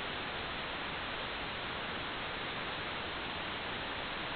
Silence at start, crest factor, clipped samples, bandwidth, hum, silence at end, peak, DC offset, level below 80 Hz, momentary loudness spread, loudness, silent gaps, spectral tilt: 0 s; 12 dB; under 0.1%; 4.9 kHz; none; 0 s; -26 dBFS; under 0.1%; -56 dBFS; 0 LU; -38 LUFS; none; -1 dB/octave